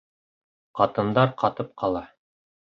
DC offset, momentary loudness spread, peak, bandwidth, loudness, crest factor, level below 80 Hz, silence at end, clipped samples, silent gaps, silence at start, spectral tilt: under 0.1%; 9 LU; -4 dBFS; 6.8 kHz; -24 LUFS; 22 dB; -58 dBFS; 0.65 s; under 0.1%; none; 0.75 s; -8.5 dB/octave